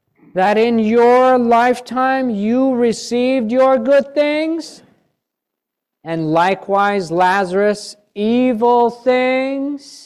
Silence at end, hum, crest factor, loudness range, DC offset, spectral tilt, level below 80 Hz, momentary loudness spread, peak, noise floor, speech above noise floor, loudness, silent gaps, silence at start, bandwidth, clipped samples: 0.1 s; none; 12 dB; 4 LU; under 0.1%; -5.5 dB/octave; -60 dBFS; 11 LU; -4 dBFS; -80 dBFS; 65 dB; -15 LUFS; none; 0.35 s; 12 kHz; under 0.1%